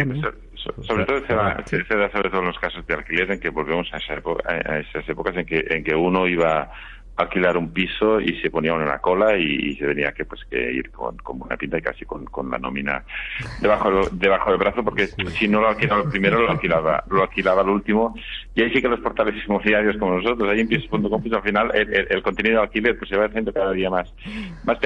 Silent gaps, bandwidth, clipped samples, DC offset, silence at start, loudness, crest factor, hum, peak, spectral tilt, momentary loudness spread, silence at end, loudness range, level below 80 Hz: none; 9.2 kHz; under 0.1%; under 0.1%; 0 s; -21 LUFS; 18 dB; none; -4 dBFS; -7 dB/octave; 10 LU; 0 s; 5 LU; -40 dBFS